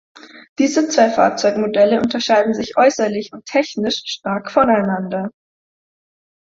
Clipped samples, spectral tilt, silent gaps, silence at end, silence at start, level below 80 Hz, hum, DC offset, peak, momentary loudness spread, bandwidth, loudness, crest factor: under 0.1%; -4.5 dB/octave; 0.49-0.56 s; 1.2 s; 0.35 s; -56 dBFS; none; under 0.1%; -2 dBFS; 8 LU; 7.8 kHz; -17 LUFS; 16 dB